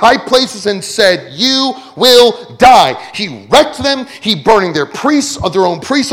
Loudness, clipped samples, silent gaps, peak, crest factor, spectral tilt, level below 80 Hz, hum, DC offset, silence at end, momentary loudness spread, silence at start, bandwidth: -10 LUFS; 2%; none; 0 dBFS; 10 dB; -3 dB/octave; -42 dBFS; none; under 0.1%; 0 s; 10 LU; 0 s; 19.5 kHz